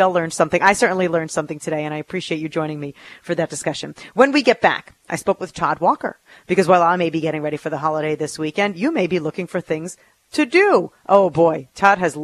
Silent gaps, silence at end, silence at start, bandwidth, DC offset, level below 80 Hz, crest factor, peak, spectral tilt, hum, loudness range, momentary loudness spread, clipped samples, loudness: none; 0 s; 0 s; 13.5 kHz; under 0.1%; -58 dBFS; 18 dB; 0 dBFS; -5 dB/octave; none; 4 LU; 12 LU; under 0.1%; -19 LUFS